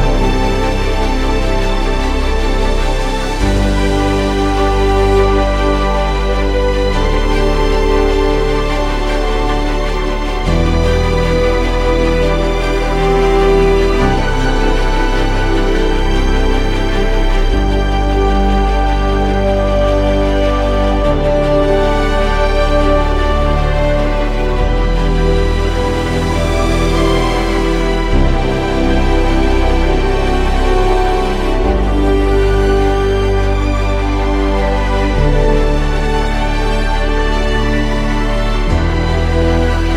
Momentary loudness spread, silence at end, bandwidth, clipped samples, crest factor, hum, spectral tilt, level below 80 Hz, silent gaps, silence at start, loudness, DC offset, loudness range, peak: 4 LU; 0 s; 11.5 kHz; under 0.1%; 12 dB; none; -6 dB/octave; -14 dBFS; none; 0 s; -14 LUFS; under 0.1%; 2 LU; 0 dBFS